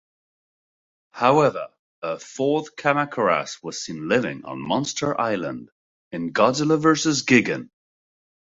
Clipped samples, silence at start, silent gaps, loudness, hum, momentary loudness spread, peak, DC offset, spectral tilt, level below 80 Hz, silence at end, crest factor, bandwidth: under 0.1%; 1.15 s; 1.79-2.02 s, 5.72-6.11 s; -22 LUFS; none; 14 LU; -2 dBFS; under 0.1%; -4.5 dB/octave; -62 dBFS; 0.85 s; 20 dB; 8 kHz